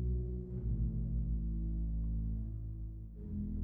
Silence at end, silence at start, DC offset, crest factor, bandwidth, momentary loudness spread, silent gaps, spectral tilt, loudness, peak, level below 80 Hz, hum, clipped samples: 0 s; 0 s; under 0.1%; 12 dB; 1.1 kHz; 8 LU; none; -13.5 dB/octave; -40 LUFS; -26 dBFS; -38 dBFS; none; under 0.1%